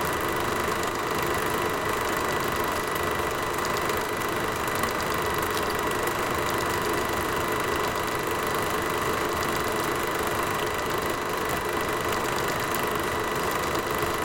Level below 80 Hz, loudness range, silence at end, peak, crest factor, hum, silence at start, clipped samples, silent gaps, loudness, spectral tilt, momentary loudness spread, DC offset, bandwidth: -46 dBFS; 1 LU; 0 s; -8 dBFS; 20 dB; none; 0 s; under 0.1%; none; -26 LUFS; -3.5 dB/octave; 1 LU; under 0.1%; 17 kHz